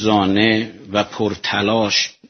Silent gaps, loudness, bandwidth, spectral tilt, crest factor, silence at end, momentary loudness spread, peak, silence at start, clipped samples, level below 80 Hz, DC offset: none; -18 LUFS; 6.6 kHz; -3 dB/octave; 18 dB; 0.2 s; 7 LU; 0 dBFS; 0 s; under 0.1%; -54 dBFS; under 0.1%